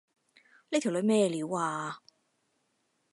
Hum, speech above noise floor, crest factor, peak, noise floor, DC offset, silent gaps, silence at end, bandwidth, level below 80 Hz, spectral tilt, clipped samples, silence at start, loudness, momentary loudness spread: none; 47 dB; 18 dB; -14 dBFS; -76 dBFS; under 0.1%; none; 1.15 s; 11.5 kHz; -84 dBFS; -5 dB/octave; under 0.1%; 0.7 s; -30 LUFS; 12 LU